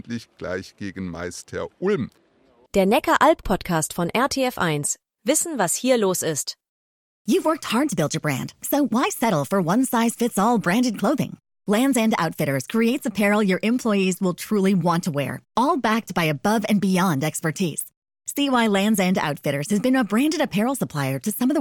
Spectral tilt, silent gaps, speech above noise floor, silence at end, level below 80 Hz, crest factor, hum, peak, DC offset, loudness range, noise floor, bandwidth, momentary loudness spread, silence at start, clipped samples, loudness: -4.5 dB/octave; 6.69-7.25 s, 17.97-18.02 s; 37 dB; 0 s; -50 dBFS; 18 dB; none; -4 dBFS; under 0.1%; 2 LU; -58 dBFS; 17.5 kHz; 11 LU; 0.05 s; under 0.1%; -22 LUFS